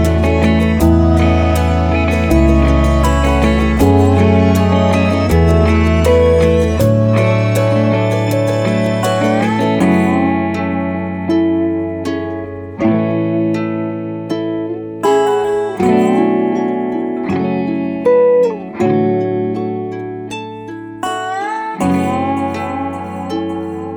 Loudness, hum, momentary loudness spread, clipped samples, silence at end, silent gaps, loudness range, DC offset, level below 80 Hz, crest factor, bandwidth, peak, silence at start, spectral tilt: -14 LUFS; none; 10 LU; under 0.1%; 0 s; none; 7 LU; under 0.1%; -24 dBFS; 14 dB; 17.5 kHz; 0 dBFS; 0 s; -7.5 dB/octave